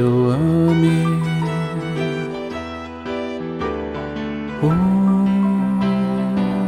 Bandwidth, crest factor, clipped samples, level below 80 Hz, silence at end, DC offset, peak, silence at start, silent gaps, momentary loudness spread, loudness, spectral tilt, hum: 10.5 kHz; 14 dB; under 0.1%; -44 dBFS; 0 s; under 0.1%; -6 dBFS; 0 s; none; 11 LU; -19 LUFS; -8 dB/octave; none